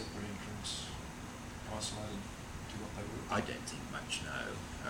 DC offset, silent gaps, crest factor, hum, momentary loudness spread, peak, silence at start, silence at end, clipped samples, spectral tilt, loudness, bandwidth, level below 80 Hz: under 0.1%; none; 20 dB; none; 9 LU; -22 dBFS; 0 s; 0 s; under 0.1%; -3.5 dB/octave; -42 LUFS; 20 kHz; -54 dBFS